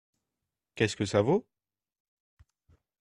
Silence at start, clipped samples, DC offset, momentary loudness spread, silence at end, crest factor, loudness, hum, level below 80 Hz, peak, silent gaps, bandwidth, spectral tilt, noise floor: 0.75 s; under 0.1%; under 0.1%; 7 LU; 1.6 s; 24 dB; -29 LUFS; none; -66 dBFS; -10 dBFS; none; 11.5 kHz; -5.5 dB/octave; -88 dBFS